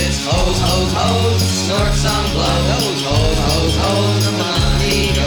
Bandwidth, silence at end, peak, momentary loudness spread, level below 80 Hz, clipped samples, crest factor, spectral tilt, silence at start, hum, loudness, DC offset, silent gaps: 19.5 kHz; 0 s; -2 dBFS; 1 LU; -22 dBFS; under 0.1%; 12 dB; -4.5 dB/octave; 0 s; none; -15 LUFS; under 0.1%; none